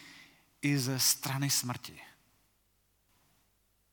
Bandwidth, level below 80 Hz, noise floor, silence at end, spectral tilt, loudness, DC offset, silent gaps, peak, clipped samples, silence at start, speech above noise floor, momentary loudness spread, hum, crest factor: 19.5 kHz; -76 dBFS; -73 dBFS; 1.85 s; -3 dB/octave; -30 LUFS; under 0.1%; none; -14 dBFS; under 0.1%; 0 s; 42 dB; 17 LU; 50 Hz at -75 dBFS; 22 dB